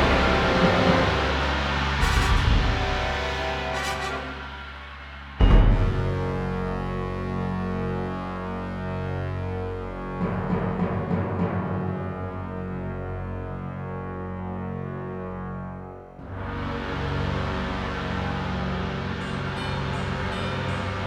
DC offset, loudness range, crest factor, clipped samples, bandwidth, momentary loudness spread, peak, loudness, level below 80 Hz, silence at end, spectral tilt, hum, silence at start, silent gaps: under 0.1%; 9 LU; 20 dB; under 0.1%; 12.5 kHz; 13 LU; -6 dBFS; -27 LUFS; -30 dBFS; 0 s; -6 dB/octave; none; 0 s; none